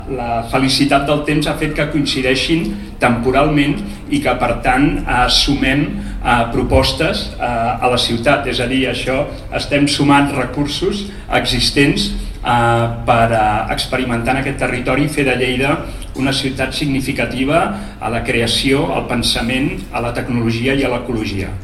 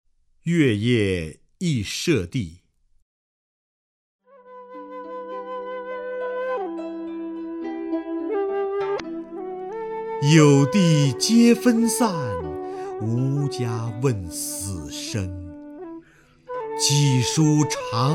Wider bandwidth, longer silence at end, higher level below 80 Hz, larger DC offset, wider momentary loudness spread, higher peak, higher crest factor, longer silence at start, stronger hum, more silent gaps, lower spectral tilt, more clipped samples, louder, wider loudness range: second, 14 kHz vs 16 kHz; about the same, 0 s vs 0 s; first, -28 dBFS vs -54 dBFS; first, 0.4% vs under 0.1%; second, 8 LU vs 17 LU; about the same, 0 dBFS vs -2 dBFS; about the same, 16 dB vs 20 dB; second, 0 s vs 0.45 s; neither; second, none vs 3.02-4.19 s; about the same, -5 dB/octave vs -5.5 dB/octave; neither; first, -16 LUFS vs -22 LUFS; second, 2 LU vs 14 LU